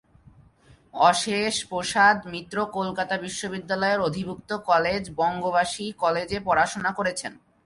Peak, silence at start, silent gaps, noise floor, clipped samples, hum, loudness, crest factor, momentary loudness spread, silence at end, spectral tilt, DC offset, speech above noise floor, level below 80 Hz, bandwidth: -4 dBFS; 0.95 s; none; -56 dBFS; under 0.1%; none; -24 LUFS; 20 dB; 12 LU; 0.3 s; -3.5 dB/octave; under 0.1%; 31 dB; -56 dBFS; 11.5 kHz